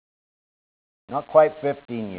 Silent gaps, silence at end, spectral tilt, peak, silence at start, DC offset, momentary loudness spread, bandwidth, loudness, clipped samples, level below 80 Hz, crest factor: none; 0 s; -10 dB/octave; -2 dBFS; 1.1 s; under 0.1%; 13 LU; 4 kHz; -22 LUFS; under 0.1%; -66 dBFS; 22 dB